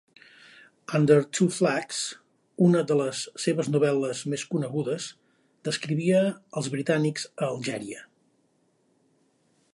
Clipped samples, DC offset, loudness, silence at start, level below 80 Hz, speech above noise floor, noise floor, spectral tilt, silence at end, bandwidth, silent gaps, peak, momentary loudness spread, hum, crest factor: under 0.1%; under 0.1%; -26 LUFS; 0.9 s; -74 dBFS; 43 dB; -68 dBFS; -5.5 dB/octave; 1.7 s; 11.5 kHz; none; -8 dBFS; 13 LU; none; 20 dB